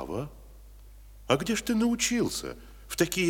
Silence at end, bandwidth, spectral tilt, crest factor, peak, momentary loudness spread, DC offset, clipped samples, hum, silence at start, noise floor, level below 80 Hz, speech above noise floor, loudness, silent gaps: 0 s; 18 kHz; -3.5 dB/octave; 22 dB; -8 dBFS; 17 LU; under 0.1%; under 0.1%; none; 0 s; -49 dBFS; -50 dBFS; 21 dB; -28 LUFS; none